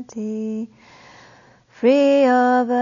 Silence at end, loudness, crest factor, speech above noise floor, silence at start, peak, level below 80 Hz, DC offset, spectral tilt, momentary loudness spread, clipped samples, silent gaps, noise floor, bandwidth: 0 s; -18 LUFS; 14 dB; 32 dB; 0 s; -6 dBFS; -70 dBFS; under 0.1%; -5.5 dB/octave; 14 LU; under 0.1%; none; -50 dBFS; 7.4 kHz